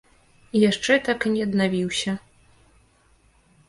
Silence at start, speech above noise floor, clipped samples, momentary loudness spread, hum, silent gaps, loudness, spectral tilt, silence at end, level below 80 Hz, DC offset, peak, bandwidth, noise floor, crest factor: 0.55 s; 38 dB; under 0.1%; 7 LU; none; none; -22 LUFS; -4.5 dB/octave; 1.5 s; -58 dBFS; under 0.1%; -6 dBFS; 11.5 kHz; -59 dBFS; 20 dB